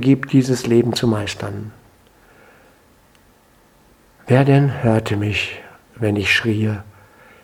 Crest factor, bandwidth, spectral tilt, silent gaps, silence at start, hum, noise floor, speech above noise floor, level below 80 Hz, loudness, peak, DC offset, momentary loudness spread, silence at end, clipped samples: 20 dB; 15 kHz; -6.5 dB/octave; none; 0 s; none; -53 dBFS; 36 dB; -50 dBFS; -18 LUFS; 0 dBFS; under 0.1%; 14 LU; 0.55 s; under 0.1%